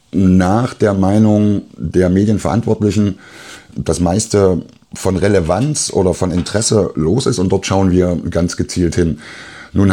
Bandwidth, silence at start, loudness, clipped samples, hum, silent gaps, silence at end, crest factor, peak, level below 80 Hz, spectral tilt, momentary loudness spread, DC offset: 13.5 kHz; 0.15 s; -15 LUFS; under 0.1%; none; none; 0 s; 14 dB; 0 dBFS; -40 dBFS; -6 dB/octave; 10 LU; 0.1%